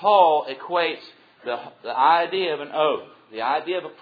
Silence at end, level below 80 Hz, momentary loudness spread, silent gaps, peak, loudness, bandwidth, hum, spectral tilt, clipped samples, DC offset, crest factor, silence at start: 0.1 s; -80 dBFS; 14 LU; none; -4 dBFS; -22 LUFS; 5 kHz; none; -6 dB/octave; under 0.1%; under 0.1%; 20 dB; 0 s